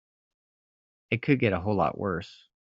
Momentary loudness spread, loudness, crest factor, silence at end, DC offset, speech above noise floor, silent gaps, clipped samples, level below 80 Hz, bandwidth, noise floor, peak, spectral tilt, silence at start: 10 LU; -27 LUFS; 22 dB; 0.3 s; under 0.1%; over 63 dB; none; under 0.1%; -60 dBFS; 7.4 kHz; under -90 dBFS; -8 dBFS; -6 dB/octave; 1.1 s